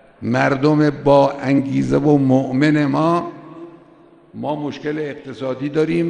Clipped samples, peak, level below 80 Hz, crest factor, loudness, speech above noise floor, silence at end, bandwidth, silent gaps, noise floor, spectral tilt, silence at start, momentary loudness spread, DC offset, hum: under 0.1%; -2 dBFS; -48 dBFS; 16 dB; -17 LUFS; 31 dB; 0 s; 9.4 kHz; none; -48 dBFS; -8 dB/octave; 0.2 s; 14 LU; under 0.1%; none